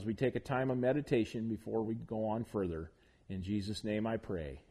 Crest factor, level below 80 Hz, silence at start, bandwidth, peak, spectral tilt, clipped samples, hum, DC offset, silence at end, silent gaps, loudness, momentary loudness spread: 16 dB; -58 dBFS; 0 s; 12.5 kHz; -20 dBFS; -7.5 dB/octave; under 0.1%; none; under 0.1%; 0.1 s; none; -37 LUFS; 9 LU